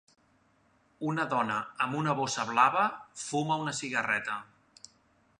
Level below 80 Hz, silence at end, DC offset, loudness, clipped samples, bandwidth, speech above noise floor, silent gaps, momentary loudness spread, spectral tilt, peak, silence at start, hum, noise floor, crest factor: -74 dBFS; 0.95 s; under 0.1%; -30 LUFS; under 0.1%; 11 kHz; 37 dB; none; 11 LU; -4 dB/octave; -10 dBFS; 1 s; none; -68 dBFS; 22 dB